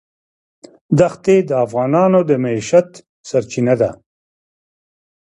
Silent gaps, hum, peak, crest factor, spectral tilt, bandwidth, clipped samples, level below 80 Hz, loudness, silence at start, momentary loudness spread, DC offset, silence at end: 3.09-3.24 s; none; 0 dBFS; 16 dB; -7 dB/octave; 11 kHz; under 0.1%; -54 dBFS; -15 LUFS; 0.9 s; 7 LU; under 0.1%; 1.35 s